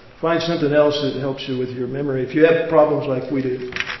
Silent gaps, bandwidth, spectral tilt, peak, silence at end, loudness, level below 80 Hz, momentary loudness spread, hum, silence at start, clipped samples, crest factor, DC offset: none; 6.2 kHz; -6.5 dB/octave; -2 dBFS; 0 s; -19 LUFS; -54 dBFS; 9 LU; none; 0.05 s; under 0.1%; 18 dB; under 0.1%